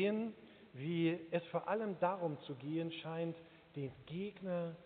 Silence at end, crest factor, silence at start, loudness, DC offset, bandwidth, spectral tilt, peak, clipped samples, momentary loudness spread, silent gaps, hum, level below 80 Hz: 0 s; 20 dB; 0 s; -41 LUFS; under 0.1%; 4.6 kHz; -5.5 dB/octave; -22 dBFS; under 0.1%; 10 LU; none; none; -80 dBFS